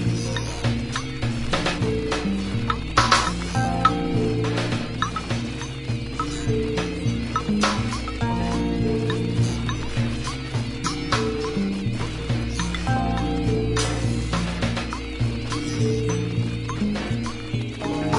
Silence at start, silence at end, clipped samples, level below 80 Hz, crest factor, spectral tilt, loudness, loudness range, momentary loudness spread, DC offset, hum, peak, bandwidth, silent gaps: 0 s; 0 s; under 0.1%; -34 dBFS; 22 dB; -5.5 dB/octave; -24 LUFS; 3 LU; 6 LU; under 0.1%; none; -2 dBFS; 11 kHz; none